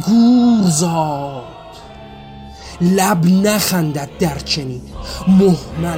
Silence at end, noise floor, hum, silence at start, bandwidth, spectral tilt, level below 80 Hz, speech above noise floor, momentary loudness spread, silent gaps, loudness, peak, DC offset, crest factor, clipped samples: 0 s; -35 dBFS; none; 0 s; 16.5 kHz; -5.5 dB/octave; -38 dBFS; 21 dB; 24 LU; none; -15 LUFS; -2 dBFS; under 0.1%; 12 dB; under 0.1%